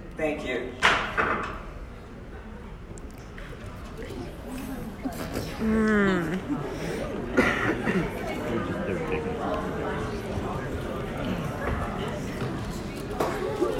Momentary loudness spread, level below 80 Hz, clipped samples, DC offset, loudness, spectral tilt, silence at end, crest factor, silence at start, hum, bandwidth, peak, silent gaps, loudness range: 19 LU; -42 dBFS; under 0.1%; under 0.1%; -29 LUFS; -5.5 dB/octave; 0 s; 24 dB; 0 s; none; 16.5 kHz; -4 dBFS; none; 11 LU